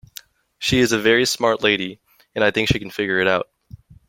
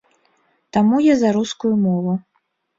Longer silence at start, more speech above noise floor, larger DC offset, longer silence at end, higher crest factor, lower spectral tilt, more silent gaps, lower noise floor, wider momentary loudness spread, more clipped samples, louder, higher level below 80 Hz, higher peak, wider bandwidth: second, 0.6 s vs 0.75 s; second, 26 dB vs 52 dB; neither; about the same, 0.65 s vs 0.6 s; first, 20 dB vs 14 dB; second, -4 dB/octave vs -6.5 dB/octave; neither; second, -44 dBFS vs -69 dBFS; about the same, 9 LU vs 9 LU; neither; about the same, -19 LUFS vs -18 LUFS; first, -46 dBFS vs -58 dBFS; about the same, -2 dBFS vs -4 dBFS; first, 16.5 kHz vs 7.8 kHz